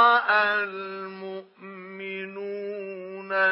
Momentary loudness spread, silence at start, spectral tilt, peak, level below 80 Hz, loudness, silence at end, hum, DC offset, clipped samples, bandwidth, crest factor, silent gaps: 19 LU; 0 s; -7 dB/octave; -6 dBFS; under -90 dBFS; -26 LUFS; 0 s; none; under 0.1%; under 0.1%; 5.8 kHz; 20 dB; none